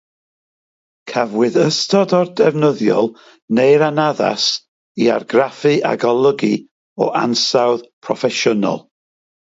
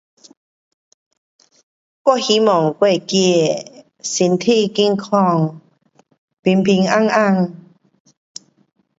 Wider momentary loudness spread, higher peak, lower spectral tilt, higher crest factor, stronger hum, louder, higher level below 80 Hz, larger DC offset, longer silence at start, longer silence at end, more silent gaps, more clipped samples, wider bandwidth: about the same, 9 LU vs 11 LU; about the same, 0 dBFS vs 0 dBFS; about the same, -4.5 dB/octave vs -5 dB/octave; about the same, 16 dB vs 18 dB; neither; about the same, -16 LUFS vs -16 LUFS; about the same, -66 dBFS vs -64 dBFS; neither; second, 1.05 s vs 2.05 s; second, 0.75 s vs 1.4 s; first, 3.42-3.48 s, 4.68-4.95 s, 6.71-6.96 s, 7.93-8.02 s vs 6.18-6.28 s, 6.39-6.43 s; neither; about the same, 8 kHz vs 8 kHz